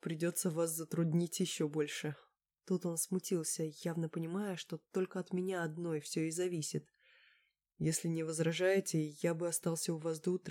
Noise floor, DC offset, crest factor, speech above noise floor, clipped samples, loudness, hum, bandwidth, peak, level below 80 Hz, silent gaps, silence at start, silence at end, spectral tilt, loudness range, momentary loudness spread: -75 dBFS; under 0.1%; 16 dB; 38 dB; under 0.1%; -37 LUFS; none; 17.5 kHz; -20 dBFS; -80 dBFS; none; 0.05 s; 0 s; -5 dB/octave; 3 LU; 6 LU